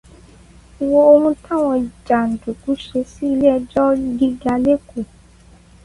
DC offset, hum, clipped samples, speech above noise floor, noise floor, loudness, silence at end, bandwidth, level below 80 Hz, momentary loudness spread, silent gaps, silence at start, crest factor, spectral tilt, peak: under 0.1%; none; under 0.1%; 30 dB; -46 dBFS; -17 LUFS; 0.8 s; 11.5 kHz; -46 dBFS; 13 LU; none; 0.8 s; 16 dB; -7 dB/octave; 0 dBFS